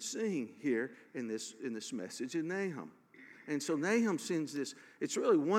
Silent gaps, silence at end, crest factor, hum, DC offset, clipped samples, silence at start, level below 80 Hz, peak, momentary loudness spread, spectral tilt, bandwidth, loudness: none; 0 s; 18 dB; none; under 0.1%; under 0.1%; 0 s; under -90 dBFS; -18 dBFS; 12 LU; -4.5 dB/octave; 16 kHz; -37 LUFS